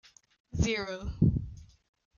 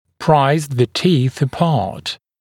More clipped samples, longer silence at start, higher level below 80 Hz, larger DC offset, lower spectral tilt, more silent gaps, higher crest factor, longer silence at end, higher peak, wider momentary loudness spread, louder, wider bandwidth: neither; first, 0.55 s vs 0.2 s; first, -42 dBFS vs -52 dBFS; neither; about the same, -6 dB/octave vs -6.5 dB/octave; neither; first, 22 dB vs 16 dB; first, 0.5 s vs 0.25 s; second, -12 dBFS vs 0 dBFS; first, 13 LU vs 10 LU; second, -31 LUFS vs -17 LUFS; second, 7.4 kHz vs 16.5 kHz